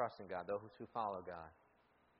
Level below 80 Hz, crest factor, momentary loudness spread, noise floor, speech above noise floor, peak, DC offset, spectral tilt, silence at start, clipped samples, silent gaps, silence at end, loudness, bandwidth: -78 dBFS; 20 dB; 10 LU; -74 dBFS; 28 dB; -26 dBFS; under 0.1%; -4.5 dB/octave; 0 s; under 0.1%; none; 0.65 s; -46 LUFS; 5.4 kHz